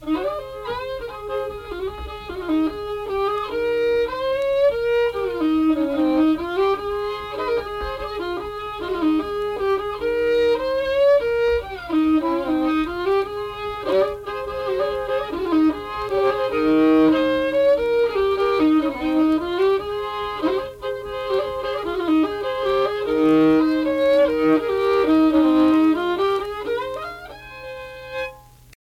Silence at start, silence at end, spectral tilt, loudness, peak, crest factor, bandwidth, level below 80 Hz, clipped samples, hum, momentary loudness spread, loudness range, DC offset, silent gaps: 0 s; 0.5 s; -6 dB/octave; -21 LUFS; -6 dBFS; 14 dB; 14 kHz; -44 dBFS; under 0.1%; none; 12 LU; 6 LU; under 0.1%; none